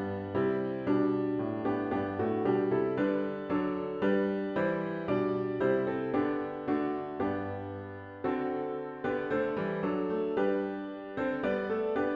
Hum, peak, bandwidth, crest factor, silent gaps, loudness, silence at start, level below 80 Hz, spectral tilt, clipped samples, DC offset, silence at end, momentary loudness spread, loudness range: none; -16 dBFS; 5.2 kHz; 16 dB; none; -32 LUFS; 0 s; -64 dBFS; -9.5 dB/octave; under 0.1%; under 0.1%; 0 s; 6 LU; 3 LU